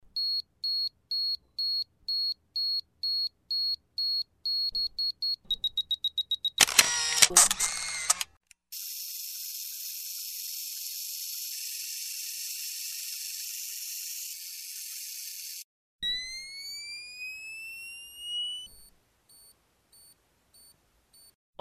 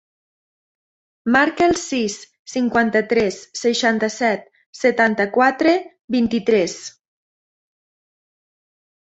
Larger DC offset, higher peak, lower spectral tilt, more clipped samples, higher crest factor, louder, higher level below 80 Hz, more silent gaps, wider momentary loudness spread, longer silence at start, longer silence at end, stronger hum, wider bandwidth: neither; about the same, -2 dBFS vs -2 dBFS; second, 2.5 dB/octave vs -4 dB/octave; neither; first, 30 dB vs 20 dB; second, -29 LUFS vs -19 LUFS; second, -64 dBFS vs -56 dBFS; first, 15.64-15.99 s vs 2.39-2.45 s, 4.66-4.73 s, 6.04-6.08 s; first, 15 LU vs 10 LU; second, 0.05 s vs 1.25 s; second, 0.3 s vs 2.2 s; neither; first, 14 kHz vs 8.2 kHz